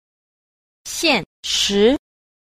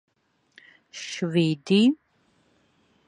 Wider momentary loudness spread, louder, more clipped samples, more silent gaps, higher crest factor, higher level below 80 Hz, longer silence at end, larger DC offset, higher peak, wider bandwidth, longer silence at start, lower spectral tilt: second, 12 LU vs 17 LU; first, -18 LUFS vs -24 LUFS; neither; first, 1.26-1.43 s vs none; about the same, 18 dB vs 18 dB; first, -48 dBFS vs -74 dBFS; second, 0.5 s vs 1.15 s; neither; first, -2 dBFS vs -10 dBFS; first, 15.5 kHz vs 10.5 kHz; about the same, 0.85 s vs 0.95 s; second, -2.5 dB/octave vs -6 dB/octave